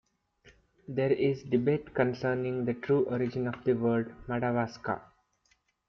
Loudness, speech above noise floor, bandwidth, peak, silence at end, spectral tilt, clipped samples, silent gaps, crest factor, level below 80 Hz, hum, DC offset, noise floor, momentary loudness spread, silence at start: -30 LUFS; 42 dB; 6.6 kHz; -12 dBFS; 0.85 s; -8.5 dB/octave; under 0.1%; none; 18 dB; -62 dBFS; none; under 0.1%; -72 dBFS; 7 LU; 0.9 s